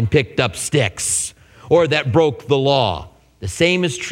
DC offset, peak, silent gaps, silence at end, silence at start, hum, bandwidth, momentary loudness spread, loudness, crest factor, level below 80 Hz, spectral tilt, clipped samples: under 0.1%; 0 dBFS; none; 0 s; 0 s; none; 16.5 kHz; 9 LU; -17 LUFS; 18 dB; -44 dBFS; -4 dB/octave; under 0.1%